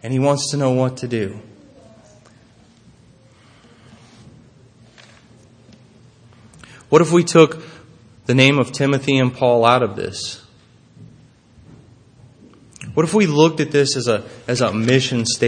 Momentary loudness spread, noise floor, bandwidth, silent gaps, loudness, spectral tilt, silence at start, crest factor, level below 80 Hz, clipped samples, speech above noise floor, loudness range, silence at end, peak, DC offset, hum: 13 LU; -50 dBFS; 9.8 kHz; none; -17 LUFS; -5 dB/octave; 0 s; 20 dB; -60 dBFS; under 0.1%; 34 dB; 11 LU; 0 s; 0 dBFS; under 0.1%; none